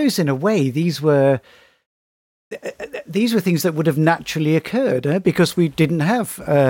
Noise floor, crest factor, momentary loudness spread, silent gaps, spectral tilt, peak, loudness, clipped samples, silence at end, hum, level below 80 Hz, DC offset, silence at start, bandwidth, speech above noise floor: under -90 dBFS; 14 dB; 11 LU; 1.86-2.51 s; -6 dB/octave; -4 dBFS; -18 LUFS; under 0.1%; 0 s; none; -56 dBFS; under 0.1%; 0 s; 17 kHz; over 72 dB